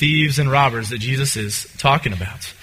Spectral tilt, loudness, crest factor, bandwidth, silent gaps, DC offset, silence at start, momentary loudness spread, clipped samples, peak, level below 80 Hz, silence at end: -4 dB/octave; -18 LUFS; 18 dB; 16 kHz; none; under 0.1%; 0 s; 9 LU; under 0.1%; 0 dBFS; -44 dBFS; 0.1 s